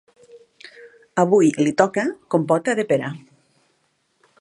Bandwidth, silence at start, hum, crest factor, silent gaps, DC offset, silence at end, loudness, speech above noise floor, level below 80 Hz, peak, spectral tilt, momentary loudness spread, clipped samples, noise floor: 11.5 kHz; 0.35 s; none; 20 dB; none; under 0.1%; 1.2 s; -20 LUFS; 48 dB; -70 dBFS; -2 dBFS; -6 dB/octave; 11 LU; under 0.1%; -67 dBFS